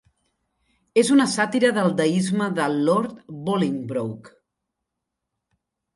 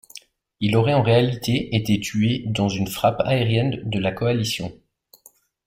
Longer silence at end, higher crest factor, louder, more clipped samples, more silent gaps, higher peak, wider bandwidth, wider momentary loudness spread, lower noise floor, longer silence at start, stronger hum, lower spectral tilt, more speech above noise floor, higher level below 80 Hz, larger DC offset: first, 1.65 s vs 0.95 s; about the same, 18 dB vs 16 dB; about the same, -22 LUFS vs -21 LUFS; neither; neither; about the same, -6 dBFS vs -4 dBFS; second, 11.5 kHz vs 16 kHz; first, 12 LU vs 7 LU; first, -82 dBFS vs -55 dBFS; first, 0.95 s vs 0.15 s; neither; about the same, -5.5 dB/octave vs -6 dB/octave; first, 61 dB vs 35 dB; second, -68 dBFS vs -50 dBFS; neither